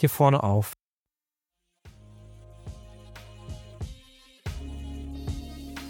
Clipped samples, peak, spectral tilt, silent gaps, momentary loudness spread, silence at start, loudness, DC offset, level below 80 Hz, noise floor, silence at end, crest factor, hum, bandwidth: under 0.1%; -8 dBFS; -7 dB/octave; 0.81-1.06 s; 27 LU; 0 s; -29 LUFS; under 0.1%; -44 dBFS; under -90 dBFS; 0 s; 22 dB; none; 17 kHz